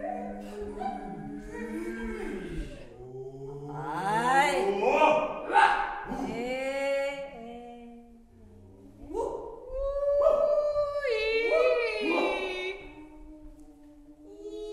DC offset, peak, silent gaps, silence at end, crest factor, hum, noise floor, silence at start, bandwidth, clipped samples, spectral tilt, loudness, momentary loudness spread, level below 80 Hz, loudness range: under 0.1%; -10 dBFS; none; 0 s; 20 dB; none; -53 dBFS; 0 s; 13 kHz; under 0.1%; -4.5 dB/octave; -28 LUFS; 20 LU; -50 dBFS; 11 LU